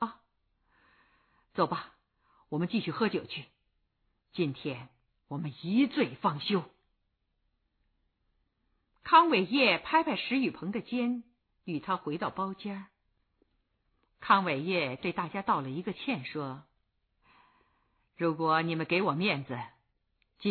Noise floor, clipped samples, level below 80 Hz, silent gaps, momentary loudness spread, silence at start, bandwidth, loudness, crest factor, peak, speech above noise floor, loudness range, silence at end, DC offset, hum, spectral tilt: -78 dBFS; under 0.1%; -72 dBFS; none; 16 LU; 0 s; 4.6 kHz; -30 LUFS; 24 dB; -10 dBFS; 48 dB; 8 LU; 0 s; under 0.1%; none; -8.5 dB/octave